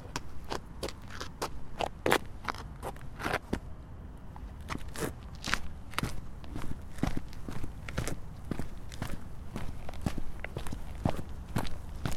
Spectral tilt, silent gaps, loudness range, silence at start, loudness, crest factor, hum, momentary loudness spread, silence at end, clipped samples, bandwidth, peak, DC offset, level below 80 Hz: -5 dB/octave; none; 5 LU; 0 s; -38 LUFS; 30 dB; none; 10 LU; 0 s; under 0.1%; 16 kHz; -4 dBFS; under 0.1%; -42 dBFS